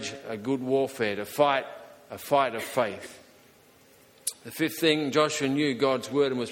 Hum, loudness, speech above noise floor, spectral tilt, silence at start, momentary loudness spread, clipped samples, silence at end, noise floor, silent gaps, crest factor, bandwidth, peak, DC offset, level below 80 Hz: none; -27 LUFS; 30 dB; -4 dB/octave; 0 s; 15 LU; under 0.1%; 0 s; -57 dBFS; none; 20 dB; 17 kHz; -8 dBFS; under 0.1%; -70 dBFS